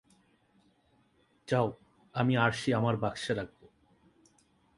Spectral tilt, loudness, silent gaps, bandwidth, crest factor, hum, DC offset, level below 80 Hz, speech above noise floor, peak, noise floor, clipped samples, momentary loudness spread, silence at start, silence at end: -6.5 dB/octave; -31 LUFS; none; 11.5 kHz; 24 dB; none; under 0.1%; -64 dBFS; 39 dB; -10 dBFS; -69 dBFS; under 0.1%; 12 LU; 1.5 s; 1.3 s